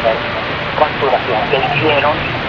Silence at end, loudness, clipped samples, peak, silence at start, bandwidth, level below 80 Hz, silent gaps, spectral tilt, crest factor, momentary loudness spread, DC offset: 0 s; -15 LUFS; under 0.1%; 0 dBFS; 0 s; 7 kHz; -38 dBFS; none; -2.5 dB/octave; 16 dB; 6 LU; under 0.1%